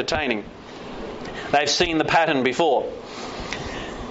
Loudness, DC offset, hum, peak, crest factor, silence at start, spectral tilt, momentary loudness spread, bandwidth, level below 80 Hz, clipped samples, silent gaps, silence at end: -22 LUFS; under 0.1%; none; -6 dBFS; 18 dB; 0 s; -2 dB/octave; 16 LU; 8 kHz; -44 dBFS; under 0.1%; none; 0 s